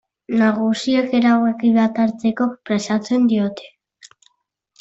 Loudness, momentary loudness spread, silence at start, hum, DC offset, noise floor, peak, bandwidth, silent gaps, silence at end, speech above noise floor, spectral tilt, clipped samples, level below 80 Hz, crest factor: -18 LUFS; 7 LU; 0.3 s; none; under 0.1%; -66 dBFS; -4 dBFS; 8 kHz; none; 0.75 s; 49 dB; -6 dB/octave; under 0.1%; -62 dBFS; 14 dB